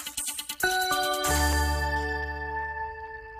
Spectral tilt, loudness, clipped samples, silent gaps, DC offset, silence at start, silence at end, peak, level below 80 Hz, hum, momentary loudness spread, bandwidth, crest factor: -3 dB/octave; -28 LUFS; under 0.1%; none; under 0.1%; 0 s; 0 s; -12 dBFS; -36 dBFS; none; 9 LU; 15.5 kHz; 16 dB